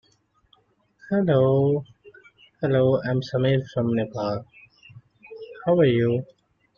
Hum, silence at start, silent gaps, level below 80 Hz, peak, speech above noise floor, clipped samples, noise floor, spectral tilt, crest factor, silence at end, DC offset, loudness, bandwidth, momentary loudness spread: none; 1.1 s; none; -60 dBFS; -8 dBFS; 43 dB; under 0.1%; -65 dBFS; -9 dB/octave; 16 dB; 0.55 s; under 0.1%; -23 LUFS; 6.8 kHz; 11 LU